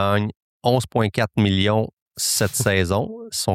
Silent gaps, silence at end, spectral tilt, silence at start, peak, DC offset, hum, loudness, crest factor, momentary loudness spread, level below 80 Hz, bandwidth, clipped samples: 0.36-0.60 s, 1.93-2.11 s; 0 s; -4.5 dB/octave; 0 s; -4 dBFS; under 0.1%; none; -21 LUFS; 18 dB; 7 LU; -52 dBFS; 16.5 kHz; under 0.1%